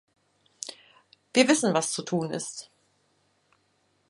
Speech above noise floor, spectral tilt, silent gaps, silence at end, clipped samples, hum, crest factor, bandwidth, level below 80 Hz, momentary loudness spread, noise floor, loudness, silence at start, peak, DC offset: 45 dB; -3.5 dB/octave; none; 1.45 s; under 0.1%; none; 24 dB; 11.5 kHz; -74 dBFS; 18 LU; -70 dBFS; -25 LUFS; 0.65 s; -6 dBFS; under 0.1%